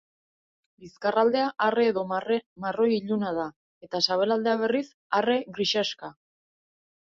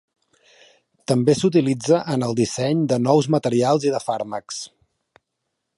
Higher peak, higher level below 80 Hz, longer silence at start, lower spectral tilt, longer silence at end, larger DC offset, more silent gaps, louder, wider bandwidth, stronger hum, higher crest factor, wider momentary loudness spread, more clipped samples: second, -8 dBFS vs -2 dBFS; second, -72 dBFS vs -62 dBFS; second, 0.8 s vs 1.1 s; second, -4.5 dB/octave vs -6 dB/octave; about the same, 1 s vs 1.1 s; neither; first, 2.46-2.56 s, 3.56-3.81 s, 4.94-5.10 s vs none; second, -26 LUFS vs -20 LUFS; second, 7.6 kHz vs 11.5 kHz; neither; about the same, 18 dB vs 18 dB; second, 9 LU vs 12 LU; neither